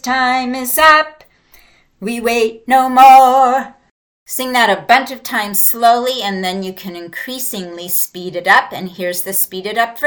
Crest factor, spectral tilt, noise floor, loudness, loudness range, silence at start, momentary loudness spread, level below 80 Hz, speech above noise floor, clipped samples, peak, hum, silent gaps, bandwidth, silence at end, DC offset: 14 dB; -2 dB/octave; -48 dBFS; -12 LUFS; 6 LU; 0.05 s; 17 LU; -52 dBFS; 35 dB; 0.2%; 0 dBFS; none; 3.91-4.26 s; 20 kHz; 0 s; under 0.1%